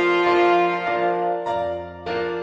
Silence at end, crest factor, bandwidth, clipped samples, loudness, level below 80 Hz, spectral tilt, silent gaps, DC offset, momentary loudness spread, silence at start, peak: 0 s; 14 dB; 7.4 kHz; under 0.1%; -21 LUFS; -58 dBFS; -6 dB/octave; none; under 0.1%; 11 LU; 0 s; -6 dBFS